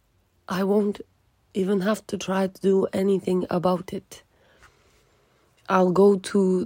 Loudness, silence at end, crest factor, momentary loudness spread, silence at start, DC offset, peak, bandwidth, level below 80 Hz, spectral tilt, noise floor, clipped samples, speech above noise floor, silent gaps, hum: -23 LUFS; 0 s; 18 dB; 12 LU; 0.5 s; under 0.1%; -6 dBFS; 16.5 kHz; -64 dBFS; -7 dB/octave; -62 dBFS; under 0.1%; 40 dB; none; none